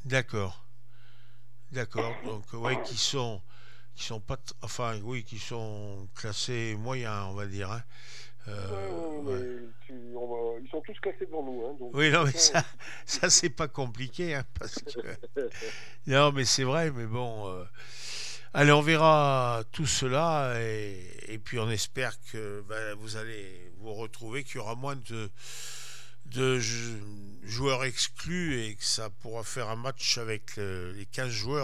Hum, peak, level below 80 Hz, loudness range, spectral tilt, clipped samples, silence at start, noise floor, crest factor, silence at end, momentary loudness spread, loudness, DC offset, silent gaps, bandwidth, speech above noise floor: none; -6 dBFS; -58 dBFS; 12 LU; -3.5 dB/octave; under 0.1%; 0.05 s; -59 dBFS; 26 dB; 0 s; 19 LU; -30 LUFS; 2%; none; 14.5 kHz; 28 dB